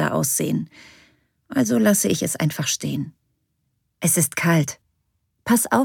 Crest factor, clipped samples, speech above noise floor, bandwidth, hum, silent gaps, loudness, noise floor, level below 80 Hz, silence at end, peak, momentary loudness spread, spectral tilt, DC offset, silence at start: 18 dB; under 0.1%; 51 dB; 19 kHz; none; none; -21 LUFS; -72 dBFS; -62 dBFS; 0 s; -4 dBFS; 12 LU; -4.5 dB/octave; under 0.1%; 0 s